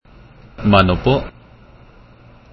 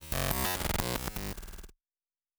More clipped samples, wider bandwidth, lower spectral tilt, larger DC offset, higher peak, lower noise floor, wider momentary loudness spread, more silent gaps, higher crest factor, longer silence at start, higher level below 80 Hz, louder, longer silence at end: neither; second, 6 kHz vs over 20 kHz; first, -8.5 dB/octave vs -3.5 dB/octave; neither; first, 0 dBFS vs -10 dBFS; second, -45 dBFS vs under -90 dBFS; second, 11 LU vs 17 LU; neither; second, 20 dB vs 26 dB; first, 0.6 s vs 0 s; first, -36 dBFS vs -42 dBFS; first, -16 LUFS vs -33 LUFS; first, 1.25 s vs 0.65 s